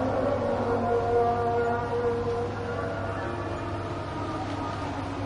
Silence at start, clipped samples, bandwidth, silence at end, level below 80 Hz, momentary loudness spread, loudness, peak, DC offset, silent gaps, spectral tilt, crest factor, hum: 0 s; under 0.1%; 10.5 kHz; 0 s; -46 dBFS; 8 LU; -29 LUFS; -14 dBFS; under 0.1%; none; -7 dB/octave; 14 dB; none